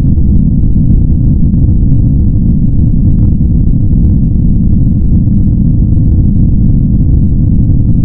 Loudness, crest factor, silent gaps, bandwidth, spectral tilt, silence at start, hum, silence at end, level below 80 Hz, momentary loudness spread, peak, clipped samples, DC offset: -9 LUFS; 6 dB; none; 1.3 kHz; -17.5 dB/octave; 0 s; none; 0 s; -10 dBFS; 1 LU; 0 dBFS; 0.2%; 3%